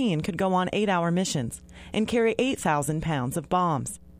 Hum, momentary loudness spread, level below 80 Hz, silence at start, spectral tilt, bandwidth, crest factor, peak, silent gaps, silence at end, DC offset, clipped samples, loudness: none; 7 LU; -52 dBFS; 0 s; -5 dB/octave; 15.5 kHz; 16 dB; -10 dBFS; none; 0.1 s; under 0.1%; under 0.1%; -26 LUFS